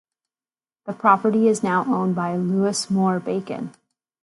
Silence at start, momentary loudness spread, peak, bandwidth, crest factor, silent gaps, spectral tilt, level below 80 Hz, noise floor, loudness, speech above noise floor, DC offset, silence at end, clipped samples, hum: 0.85 s; 15 LU; -2 dBFS; 11.5 kHz; 20 dB; none; -6 dB/octave; -68 dBFS; under -90 dBFS; -21 LUFS; over 70 dB; under 0.1%; 0.55 s; under 0.1%; none